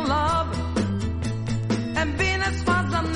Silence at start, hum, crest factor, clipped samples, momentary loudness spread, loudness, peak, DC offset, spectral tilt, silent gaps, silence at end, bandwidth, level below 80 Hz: 0 s; none; 16 dB; under 0.1%; 5 LU; -24 LUFS; -8 dBFS; under 0.1%; -5.5 dB/octave; none; 0 s; 11.5 kHz; -34 dBFS